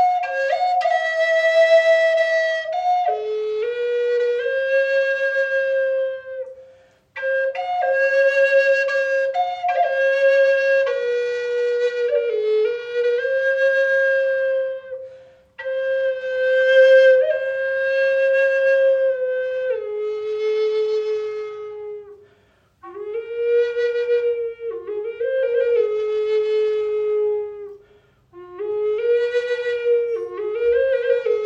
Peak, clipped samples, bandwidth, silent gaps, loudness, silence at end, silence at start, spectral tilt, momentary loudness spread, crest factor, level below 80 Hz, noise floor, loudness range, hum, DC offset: -4 dBFS; under 0.1%; 7.6 kHz; none; -19 LUFS; 0 s; 0 s; -2 dB/octave; 13 LU; 16 dB; -66 dBFS; -58 dBFS; 7 LU; none; under 0.1%